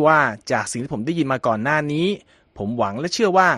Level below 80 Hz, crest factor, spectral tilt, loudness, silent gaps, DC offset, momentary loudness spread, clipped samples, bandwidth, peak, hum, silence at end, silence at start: -56 dBFS; 18 dB; -5 dB/octave; -21 LUFS; none; under 0.1%; 9 LU; under 0.1%; 12.5 kHz; -2 dBFS; none; 0 s; 0 s